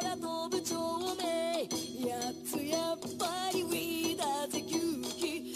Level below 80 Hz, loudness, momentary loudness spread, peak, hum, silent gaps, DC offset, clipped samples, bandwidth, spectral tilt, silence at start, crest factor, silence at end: -72 dBFS; -35 LUFS; 4 LU; -18 dBFS; none; none; under 0.1%; under 0.1%; 15.5 kHz; -3 dB/octave; 0 s; 18 dB; 0 s